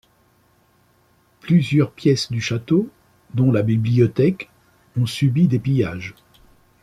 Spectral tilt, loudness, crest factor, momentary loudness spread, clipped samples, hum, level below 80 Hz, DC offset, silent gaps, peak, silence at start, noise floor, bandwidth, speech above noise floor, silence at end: -7 dB/octave; -19 LUFS; 16 dB; 15 LU; under 0.1%; none; -54 dBFS; under 0.1%; none; -4 dBFS; 1.45 s; -59 dBFS; 12.5 kHz; 41 dB; 0.7 s